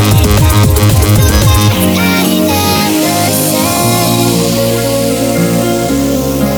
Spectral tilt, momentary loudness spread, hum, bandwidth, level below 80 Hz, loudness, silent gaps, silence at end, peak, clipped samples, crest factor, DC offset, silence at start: -5 dB/octave; 4 LU; none; over 20 kHz; -20 dBFS; -10 LUFS; none; 0 s; 0 dBFS; under 0.1%; 8 dB; under 0.1%; 0 s